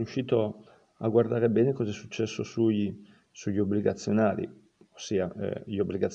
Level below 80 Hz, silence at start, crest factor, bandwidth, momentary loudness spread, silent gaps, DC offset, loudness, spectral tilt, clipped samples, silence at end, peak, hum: -66 dBFS; 0 s; 18 dB; 8.2 kHz; 10 LU; none; under 0.1%; -29 LUFS; -7 dB/octave; under 0.1%; 0 s; -10 dBFS; none